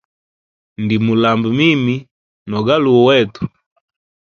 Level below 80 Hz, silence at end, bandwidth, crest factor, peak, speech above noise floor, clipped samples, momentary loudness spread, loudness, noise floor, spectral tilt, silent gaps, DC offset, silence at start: -52 dBFS; 0.85 s; 6.8 kHz; 16 dB; 0 dBFS; over 77 dB; under 0.1%; 14 LU; -14 LUFS; under -90 dBFS; -7 dB/octave; 2.11-2.46 s; under 0.1%; 0.8 s